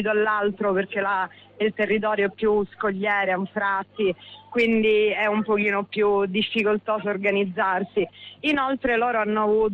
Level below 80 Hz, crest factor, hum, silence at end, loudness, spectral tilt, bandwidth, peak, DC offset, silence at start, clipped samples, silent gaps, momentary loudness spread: -56 dBFS; 12 dB; none; 0 s; -23 LUFS; -7 dB/octave; 5.8 kHz; -10 dBFS; under 0.1%; 0 s; under 0.1%; none; 6 LU